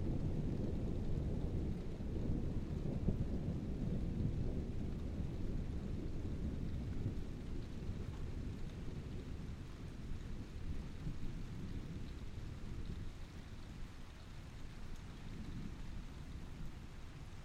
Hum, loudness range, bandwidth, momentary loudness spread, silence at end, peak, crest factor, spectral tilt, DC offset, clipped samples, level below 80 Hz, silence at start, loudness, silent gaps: none; 10 LU; 10 kHz; 12 LU; 0 s; -20 dBFS; 22 dB; -8 dB/octave; under 0.1%; under 0.1%; -46 dBFS; 0 s; -45 LUFS; none